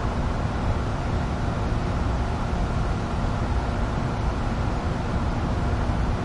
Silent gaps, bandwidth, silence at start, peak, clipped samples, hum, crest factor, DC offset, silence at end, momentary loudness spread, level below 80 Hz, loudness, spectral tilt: none; 11 kHz; 0 s; -12 dBFS; under 0.1%; none; 12 dB; under 0.1%; 0 s; 1 LU; -28 dBFS; -27 LUFS; -7 dB/octave